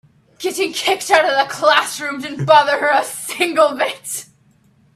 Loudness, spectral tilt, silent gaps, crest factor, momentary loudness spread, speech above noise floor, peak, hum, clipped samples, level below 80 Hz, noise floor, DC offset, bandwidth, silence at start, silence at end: -16 LUFS; -2.5 dB/octave; none; 18 dB; 12 LU; 38 dB; 0 dBFS; none; under 0.1%; -64 dBFS; -55 dBFS; under 0.1%; 15.5 kHz; 0.4 s; 0.7 s